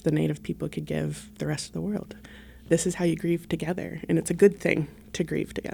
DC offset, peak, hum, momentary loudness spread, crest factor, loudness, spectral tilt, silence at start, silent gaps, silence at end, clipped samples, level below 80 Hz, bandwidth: under 0.1%; -6 dBFS; none; 13 LU; 20 dB; -28 LUFS; -6 dB/octave; 0.05 s; none; 0 s; under 0.1%; -52 dBFS; 18 kHz